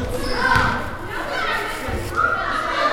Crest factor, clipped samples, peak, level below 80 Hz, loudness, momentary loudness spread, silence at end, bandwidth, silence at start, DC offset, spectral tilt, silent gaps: 18 dB; under 0.1%; -2 dBFS; -34 dBFS; -21 LUFS; 9 LU; 0 s; 16.5 kHz; 0 s; under 0.1%; -4.5 dB/octave; none